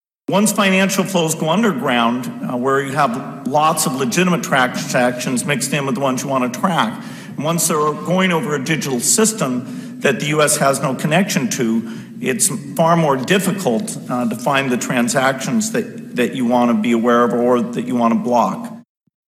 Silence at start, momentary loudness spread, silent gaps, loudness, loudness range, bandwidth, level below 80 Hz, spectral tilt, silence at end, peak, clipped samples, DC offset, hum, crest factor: 0.3 s; 7 LU; none; -17 LUFS; 2 LU; 16 kHz; -68 dBFS; -4 dB/octave; 0.55 s; 0 dBFS; under 0.1%; under 0.1%; none; 16 dB